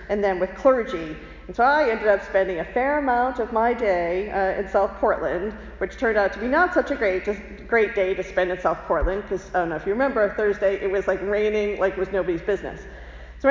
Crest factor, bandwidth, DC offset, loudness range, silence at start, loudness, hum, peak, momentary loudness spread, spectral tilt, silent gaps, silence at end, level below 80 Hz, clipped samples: 16 dB; 7.6 kHz; under 0.1%; 2 LU; 0 s; -23 LUFS; none; -6 dBFS; 10 LU; -6.5 dB/octave; none; 0 s; -40 dBFS; under 0.1%